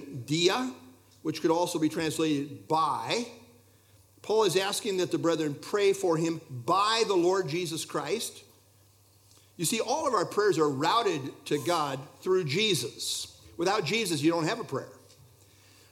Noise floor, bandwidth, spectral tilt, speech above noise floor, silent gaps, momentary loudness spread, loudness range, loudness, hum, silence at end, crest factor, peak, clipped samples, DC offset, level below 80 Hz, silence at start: -61 dBFS; 16.5 kHz; -4 dB/octave; 33 dB; none; 9 LU; 3 LU; -28 LUFS; none; 0.95 s; 18 dB; -10 dBFS; under 0.1%; under 0.1%; -72 dBFS; 0 s